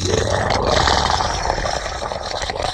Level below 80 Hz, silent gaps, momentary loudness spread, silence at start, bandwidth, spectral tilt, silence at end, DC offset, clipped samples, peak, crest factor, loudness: -30 dBFS; none; 9 LU; 0 s; 13.5 kHz; -3.5 dB/octave; 0 s; under 0.1%; under 0.1%; 0 dBFS; 18 dB; -19 LUFS